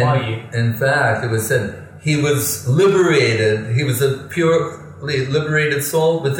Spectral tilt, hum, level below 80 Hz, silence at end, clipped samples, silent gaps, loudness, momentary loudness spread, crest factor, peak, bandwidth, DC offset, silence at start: -5 dB/octave; none; -54 dBFS; 0 s; under 0.1%; none; -17 LUFS; 8 LU; 14 dB; -4 dBFS; 17 kHz; under 0.1%; 0 s